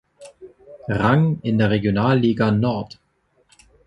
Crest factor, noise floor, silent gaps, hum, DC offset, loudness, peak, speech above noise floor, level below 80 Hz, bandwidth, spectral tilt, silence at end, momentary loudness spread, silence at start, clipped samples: 18 dB; -63 dBFS; none; none; under 0.1%; -19 LUFS; -2 dBFS; 45 dB; -48 dBFS; 10.5 kHz; -8.5 dB/octave; 1 s; 11 LU; 0.2 s; under 0.1%